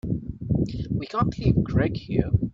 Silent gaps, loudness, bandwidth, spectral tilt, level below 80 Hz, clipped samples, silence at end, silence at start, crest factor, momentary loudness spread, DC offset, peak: none; -25 LUFS; 7.4 kHz; -9 dB/octave; -38 dBFS; under 0.1%; 0 s; 0.05 s; 18 dB; 7 LU; under 0.1%; -6 dBFS